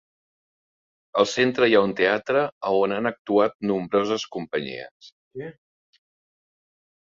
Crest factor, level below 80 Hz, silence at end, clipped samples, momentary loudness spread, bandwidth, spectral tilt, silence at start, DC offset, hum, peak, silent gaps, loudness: 20 dB; -66 dBFS; 1.5 s; under 0.1%; 19 LU; 7.6 kHz; -5 dB/octave; 1.15 s; under 0.1%; none; -4 dBFS; 2.52-2.61 s, 3.19-3.25 s, 3.55-3.60 s, 4.91-5.00 s, 5.12-5.31 s; -23 LUFS